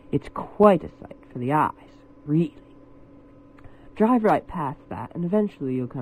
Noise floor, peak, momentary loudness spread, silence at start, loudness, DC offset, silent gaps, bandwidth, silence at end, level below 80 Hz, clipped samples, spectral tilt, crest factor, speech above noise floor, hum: -49 dBFS; -2 dBFS; 18 LU; 0.1 s; -23 LUFS; under 0.1%; none; 13 kHz; 0 s; -52 dBFS; under 0.1%; -9 dB/octave; 22 dB; 26 dB; none